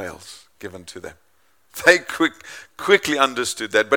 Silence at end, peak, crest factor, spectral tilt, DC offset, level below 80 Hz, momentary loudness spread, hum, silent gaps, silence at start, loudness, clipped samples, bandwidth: 0 s; 0 dBFS; 22 dB; -2.5 dB/octave; 0.1%; -60 dBFS; 23 LU; none; none; 0 s; -18 LUFS; under 0.1%; 18 kHz